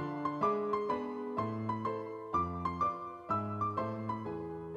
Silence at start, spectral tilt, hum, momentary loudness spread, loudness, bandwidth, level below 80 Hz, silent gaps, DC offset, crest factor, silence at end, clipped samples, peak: 0 s; -8.5 dB/octave; none; 6 LU; -36 LUFS; 8.8 kHz; -62 dBFS; none; under 0.1%; 16 dB; 0 s; under 0.1%; -20 dBFS